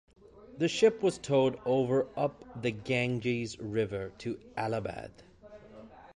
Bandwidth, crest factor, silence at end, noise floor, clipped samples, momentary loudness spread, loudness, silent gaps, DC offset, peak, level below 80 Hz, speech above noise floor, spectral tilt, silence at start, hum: 11.5 kHz; 20 dB; 0.05 s; -52 dBFS; under 0.1%; 18 LU; -31 LUFS; none; under 0.1%; -12 dBFS; -62 dBFS; 22 dB; -6 dB/octave; 0.35 s; none